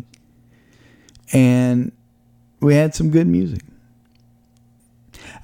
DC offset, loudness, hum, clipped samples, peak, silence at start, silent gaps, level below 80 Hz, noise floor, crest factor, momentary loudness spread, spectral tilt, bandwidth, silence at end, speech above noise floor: under 0.1%; -17 LUFS; none; under 0.1%; -2 dBFS; 1.3 s; none; -46 dBFS; -55 dBFS; 18 dB; 13 LU; -7.5 dB/octave; 16 kHz; 0.05 s; 40 dB